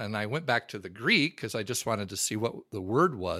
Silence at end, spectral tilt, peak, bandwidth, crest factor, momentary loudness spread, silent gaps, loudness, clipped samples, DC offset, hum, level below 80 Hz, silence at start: 0 s; -3.5 dB/octave; -10 dBFS; 16 kHz; 20 dB; 10 LU; none; -29 LUFS; under 0.1%; under 0.1%; none; -64 dBFS; 0 s